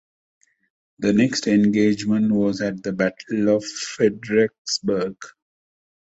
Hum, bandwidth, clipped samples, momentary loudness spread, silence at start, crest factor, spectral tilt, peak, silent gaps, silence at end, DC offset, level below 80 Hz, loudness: none; 8 kHz; under 0.1%; 7 LU; 1 s; 16 dB; -5 dB/octave; -6 dBFS; 4.58-4.65 s; 0.75 s; under 0.1%; -58 dBFS; -21 LUFS